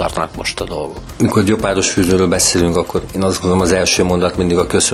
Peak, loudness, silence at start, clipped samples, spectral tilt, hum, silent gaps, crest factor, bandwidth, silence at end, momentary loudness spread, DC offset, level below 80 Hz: -2 dBFS; -15 LUFS; 0 s; under 0.1%; -4 dB/octave; none; none; 14 dB; 15 kHz; 0 s; 9 LU; under 0.1%; -34 dBFS